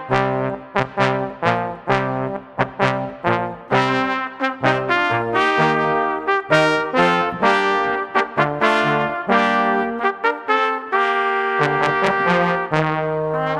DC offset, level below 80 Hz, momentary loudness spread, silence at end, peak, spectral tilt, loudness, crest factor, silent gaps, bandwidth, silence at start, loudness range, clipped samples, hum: under 0.1%; -52 dBFS; 6 LU; 0 s; -2 dBFS; -6 dB/octave; -19 LUFS; 18 dB; none; 12 kHz; 0 s; 3 LU; under 0.1%; none